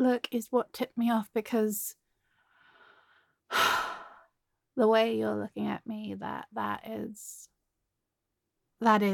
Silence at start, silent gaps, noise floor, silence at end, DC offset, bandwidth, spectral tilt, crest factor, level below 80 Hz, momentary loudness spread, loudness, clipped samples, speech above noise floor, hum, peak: 0 s; none; -85 dBFS; 0 s; under 0.1%; 17.5 kHz; -4.5 dB/octave; 22 dB; -74 dBFS; 14 LU; -30 LUFS; under 0.1%; 55 dB; none; -10 dBFS